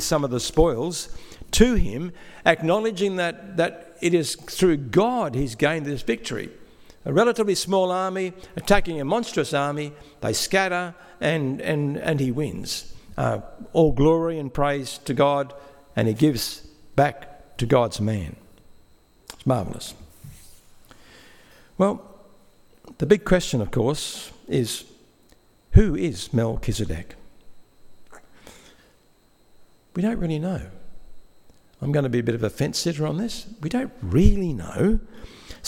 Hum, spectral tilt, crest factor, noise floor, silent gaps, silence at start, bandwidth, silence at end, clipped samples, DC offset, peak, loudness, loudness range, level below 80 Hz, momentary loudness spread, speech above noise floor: none; -5.5 dB/octave; 24 dB; -58 dBFS; none; 0 s; 17 kHz; 0 s; under 0.1%; under 0.1%; 0 dBFS; -24 LUFS; 9 LU; -34 dBFS; 13 LU; 36 dB